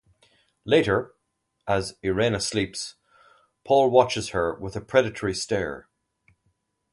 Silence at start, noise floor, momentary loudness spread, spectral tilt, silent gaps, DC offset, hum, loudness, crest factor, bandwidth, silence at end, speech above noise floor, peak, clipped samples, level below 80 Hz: 0.65 s; -77 dBFS; 15 LU; -4.5 dB/octave; none; under 0.1%; none; -24 LUFS; 22 dB; 11.5 kHz; 1.1 s; 53 dB; -4 dBFS; under 0.1%; -52 dBFS